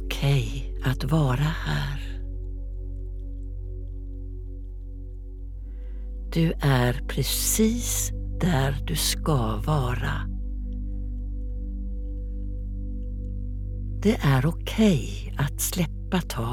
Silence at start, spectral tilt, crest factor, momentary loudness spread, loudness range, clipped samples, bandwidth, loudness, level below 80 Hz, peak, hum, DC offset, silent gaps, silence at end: 0 s; -5 dB/octave; 18 dB; 16 LU; 13 LU; under 0.1%; 17.5 kHz; -27 LUFS; -32 dBFS; -8 dBFS; none; under 0.1%; none; 0 s